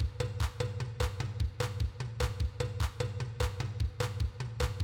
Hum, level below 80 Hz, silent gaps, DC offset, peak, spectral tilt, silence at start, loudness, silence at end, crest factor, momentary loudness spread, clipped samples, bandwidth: none; -38 dBFS; none; under 0.1%; -18 dBFS; -5.5 dB/octave; 0 s; -36 LUFS; 0 s; 16 dB; 2 LU; under 0.1%; 18 kHz